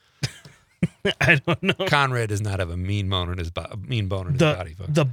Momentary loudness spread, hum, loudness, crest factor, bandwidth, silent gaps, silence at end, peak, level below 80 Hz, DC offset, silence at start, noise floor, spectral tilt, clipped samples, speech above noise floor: 12 LU; none; -23 LUFS; 22 dB; 18 kHz; none; 0 s; -2 dBFS; -50 dBFS; under 0.1%; 0.2 s; -49 dBFS; -5.5 dB/octave; under 0.1%; 27 dB